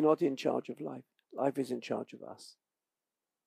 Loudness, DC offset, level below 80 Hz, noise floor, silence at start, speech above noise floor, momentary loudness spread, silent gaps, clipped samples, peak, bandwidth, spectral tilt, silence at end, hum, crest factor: -35 LUFS; under 0.1%; under -90 dBFS; under -90 dBFS; 0 s; over 56 dB; 19 LU; none; under 0.1%; -14 dBFS; 15 kHz; -6.5 dB/octave; 0.95 s; none; 22 dB